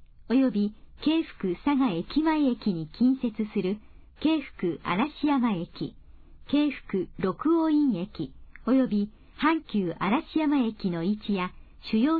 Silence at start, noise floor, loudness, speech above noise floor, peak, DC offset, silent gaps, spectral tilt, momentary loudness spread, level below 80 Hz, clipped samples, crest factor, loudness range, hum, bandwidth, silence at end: 0.2 s; -48 dBFS; -27 LUFS; 22 dB; -12 dBFS; under 0.1%; none; -9.5 dB/octave; 8 LU; -52 dBFS; under 0.1%; 14 dB; 2 LU; none; 4.8 kHz; 0 s